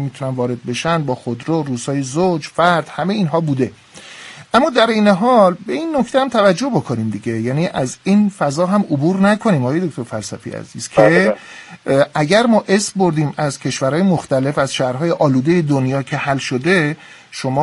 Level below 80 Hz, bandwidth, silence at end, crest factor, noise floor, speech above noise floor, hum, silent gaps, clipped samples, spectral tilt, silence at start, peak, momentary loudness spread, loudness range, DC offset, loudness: -54 dBFS; 11.5 kHz; 0 s; 16 dB; -36 dBFS; 21 dB; none; none; under 0.1%; -6 dB/octave; 0 s; 0 dBFS; 10 LU; 3 LU; under 0.1%; -16 LUFS